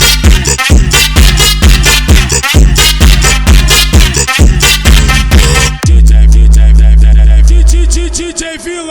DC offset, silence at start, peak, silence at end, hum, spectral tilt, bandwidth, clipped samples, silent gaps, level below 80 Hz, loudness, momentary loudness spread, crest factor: under 0.1%; 0 s; 0 dBFS; 0 s; none; -3.5 dB/octave; over 20 kHz; 10%; none; -6 dBFS; -6 LUFS; 4 LU; 4 dB